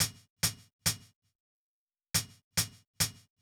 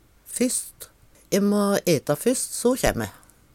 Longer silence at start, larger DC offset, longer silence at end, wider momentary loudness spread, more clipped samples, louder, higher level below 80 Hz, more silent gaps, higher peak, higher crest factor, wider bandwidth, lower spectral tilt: second, 0 s vs 0.3 s; neither; second, 0.3 s vs 0.45 s; second, 1 LU vs 14 LU; neither; second, -33 LUFS vs -23 LUFS; second, -58 dBFS vs -44 dBFS; first, 0.30-0.36 s, 0.73-0.79 s, 1.16-1.22 s, 1.35-1.87 s, 2.44-2.51 s, 2.87-2.94 s vs none; second, -14 dBFS vs -4 dBFS; about the same, 22 dB vs 20 dB; first, over 20 kHz vs 17 kHz; second, -1.5 dB/octave vs -4.5 dB/octave